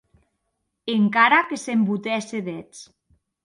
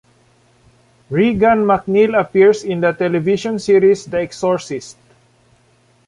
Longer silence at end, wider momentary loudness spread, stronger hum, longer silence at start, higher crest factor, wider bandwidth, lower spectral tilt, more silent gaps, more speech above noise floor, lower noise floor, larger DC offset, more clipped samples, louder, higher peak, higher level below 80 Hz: second, 0.6 s vs 1.15 s; first, 17 LU vs 9 LU; neither; second, 0.85 s vs 1.1 s; first, 20 dB vs 14 dB; about the same, 11.5 kHz vs 11 kHz; second, -5 dB/octave vs -6.5 dB/octave; neither; first, 55 dB vs 40 dB; first, -77 dBFS vs -55 dBFS; neither; neither; second, -21 LUFS vs -15 LUFS; about the same, -4 dBFS vs -2 dBFS; second, -70 dBFS vs -50 dBFS